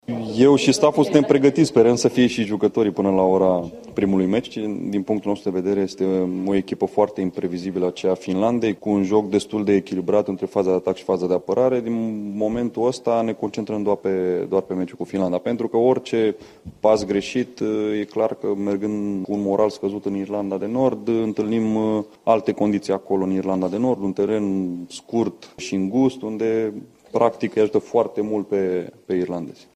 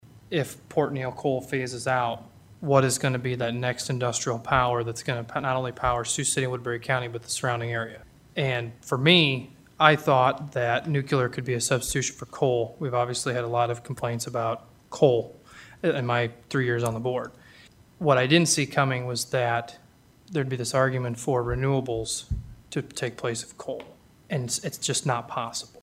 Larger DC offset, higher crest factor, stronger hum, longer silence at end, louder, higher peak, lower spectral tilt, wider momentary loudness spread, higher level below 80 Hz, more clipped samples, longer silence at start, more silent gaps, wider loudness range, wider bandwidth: neither; second, 18 dB vs 26 dB; neither; about the same, 0.2 s vs 0.15 s; first, -21 LUFS vs -26 LUFS; about the same, -2 dBFS vs 0 dBFS; first, -6.5 dB/octave vs -4 dB/octave; about the same, 9 LU vs 11 LU; second, -58 dBFS vs -50 dBFS; neither; about the same, 0.1 s vs 0.15 s; neither; about the same, 5 LU vs 5 LU; second, 12.5 kHz vs 16 kHz